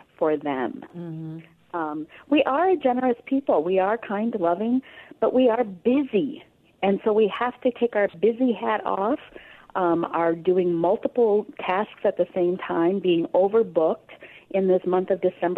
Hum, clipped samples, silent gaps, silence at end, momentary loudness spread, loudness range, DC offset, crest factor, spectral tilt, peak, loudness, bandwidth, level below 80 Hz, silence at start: none; under 0.1%; none; 0 s; 10 LU; 1 LU; under 0.1%; 16 dB; -9 dB/octave; -8 dBFS; -23 LUFS; 4.3 kHz; -66 dBFS; 0.2 s